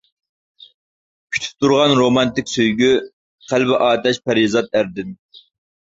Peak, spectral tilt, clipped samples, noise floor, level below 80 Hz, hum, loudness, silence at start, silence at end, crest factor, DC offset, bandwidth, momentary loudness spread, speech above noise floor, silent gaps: -2 dBFS; -4.5 dB/octave; under 0.1%; under -90 dBFS; -54 dBFS; none; -17 LUFS; 1.3 s; 0.8 s; 16 dB; under 0.1%; 7.8 kHz; 10 LU; over 74 dB; 3.13-3.38 s